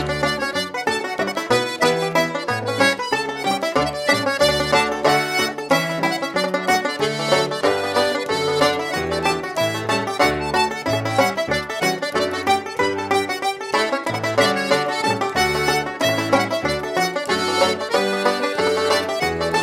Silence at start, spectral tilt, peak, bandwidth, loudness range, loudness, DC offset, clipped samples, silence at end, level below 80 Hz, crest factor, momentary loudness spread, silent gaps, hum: 0 s; -3.5 dB/octave; -4 dBFS; 16 kHz; 2 LU; -20 LUFS; under 0.1%; under 0.1%; 0 s; -48 dBFS; 16 dB; 5 LU; none; none